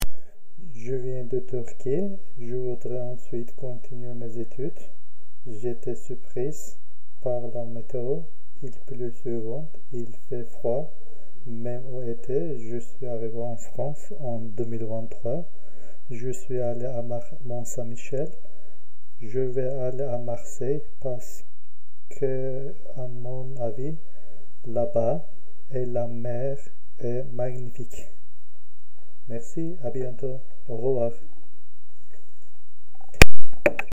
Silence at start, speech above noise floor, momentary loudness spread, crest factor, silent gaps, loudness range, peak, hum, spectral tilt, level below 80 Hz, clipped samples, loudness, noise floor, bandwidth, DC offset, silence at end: 0 s; 42 dB; 13 LU; 22 dB; none; 5 LU; 0 dBFS; none; -5.5 dB/octave; -40 dBFS; 0.6%; -31 LUFS; -73 dBFS; 16 kHz; 10%; 0 s